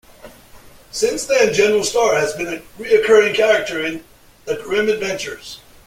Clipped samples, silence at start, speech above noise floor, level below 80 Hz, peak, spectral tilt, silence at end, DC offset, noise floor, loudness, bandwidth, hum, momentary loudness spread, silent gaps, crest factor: under 0.1%; 0.25 s; 26 dB; -50 dBFS; -2 dBFS; -2.5 dB/octave; 0.3 s; under 0.1%; -43 dBFS; -17 LUFS; 16 kHz; none; 16 LU; none; 16 dB